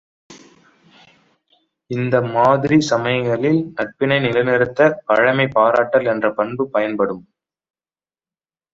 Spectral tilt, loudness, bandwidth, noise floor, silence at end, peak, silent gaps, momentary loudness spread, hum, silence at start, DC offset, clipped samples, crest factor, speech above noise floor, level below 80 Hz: -6 dB/octave; -17 LUFS; 7.8 kHz; under -90 dBFS; 1.55 s; -2 dBFS; none; 7 LU; none; 0.3 s; under 0.1%; under 0.1%; 18 dB; over 73 dB; -58 dBFS